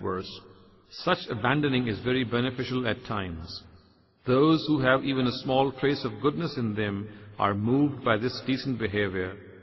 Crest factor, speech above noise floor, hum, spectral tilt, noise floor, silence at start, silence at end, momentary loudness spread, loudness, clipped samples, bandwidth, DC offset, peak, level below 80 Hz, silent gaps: 18 dB; 32 dB; none; -7.5 dB/octave; -59 dBFS; 0 s; 0 s; 13 LU; -27 LUFS; under 0.1%; 6 kHz; under 0.1%; -8 dBFS; -56 dBFS; none